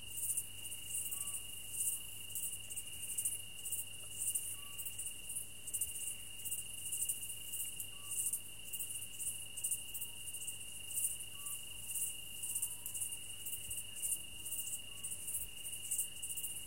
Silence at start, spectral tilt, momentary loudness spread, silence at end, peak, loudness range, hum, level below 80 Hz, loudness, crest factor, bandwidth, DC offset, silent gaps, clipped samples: 0 s; 0.5 dB/octave; 6 LU; 0 s; -22 dBFS; 1 LU; none; -68 dBFS; -40 LUFS; 22 dB; 17 kHz; 0.3%; none; under 0.1%